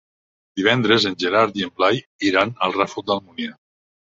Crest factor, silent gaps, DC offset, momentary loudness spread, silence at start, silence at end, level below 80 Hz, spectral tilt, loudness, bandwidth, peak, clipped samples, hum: 20 dB; 2.06-2.19 s; under 0.1%; 13 LU; 0.55 s; 0.55 s; -60 dBFS; -5 dB/octave; -19 LUFS; 7.8 kHz; -2 dBFS; under 0.1%; none